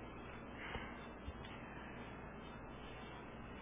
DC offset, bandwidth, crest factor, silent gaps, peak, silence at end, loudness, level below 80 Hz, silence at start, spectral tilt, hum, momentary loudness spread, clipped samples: under 0.1%; 3.8 kHz; 18 dB; none; -34 dBFS; 0 s; -51 LUFS; -58 dBFS; 0 s; -4 dB/octave; none; 5 LU; under 0.1%